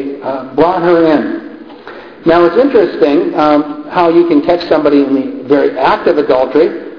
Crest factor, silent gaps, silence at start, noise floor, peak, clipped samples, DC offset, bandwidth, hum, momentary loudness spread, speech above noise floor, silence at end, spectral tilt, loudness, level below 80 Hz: 10 dB; none; 0 s; -31 dBFS; 0 dBFS; 0.1%; 0.3%; 5.4 kHz; none; 11 LU; 21 dB; 0 s; -8 dB/octave; -11 LUFS; -46 dBFS